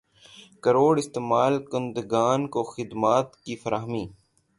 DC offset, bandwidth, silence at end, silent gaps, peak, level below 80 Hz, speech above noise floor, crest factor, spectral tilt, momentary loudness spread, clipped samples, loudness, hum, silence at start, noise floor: under 0.1%; 11.5 kHz; 0.45 s; none; -6 dBFS; -62 dBFS; 27 dB; 18 dB; -6 dB/octave; 12 LU; under 0.1%; -25 LUFS; none; 0.4 s; -51 dBFS